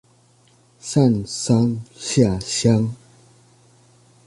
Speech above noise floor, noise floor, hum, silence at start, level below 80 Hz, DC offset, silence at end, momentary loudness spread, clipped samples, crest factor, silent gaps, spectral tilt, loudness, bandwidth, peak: 37 dB; -56 dBFS; none; 0.85 s; -48 dBFS; under 0.1%; 1.3 s; 10 LU; under 0.1%; 18 dB; none; -6 dB/octave; -20 LUFS; 11.5 kHz; -4 dBFS